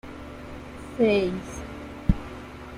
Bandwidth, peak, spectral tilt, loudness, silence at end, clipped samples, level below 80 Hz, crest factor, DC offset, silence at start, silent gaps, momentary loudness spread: 15 kHz; -6 dBFS; -7 dB/octave; -27 LUFS; 0 s; under 0.1%; -38 dBFS; 22 dB; under 0.1%; 0.05 s; none; 18 LU